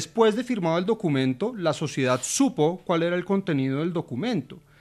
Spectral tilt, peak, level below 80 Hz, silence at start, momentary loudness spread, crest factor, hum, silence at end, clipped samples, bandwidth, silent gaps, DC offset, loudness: -5 dB/octave; -8 dBFS; -64 dBFS; 0 s; 6 LU; 18 dB; none; 0.2 s; under 0.1%; 13.5 kHz; none; under 0.1%; -25 LUFS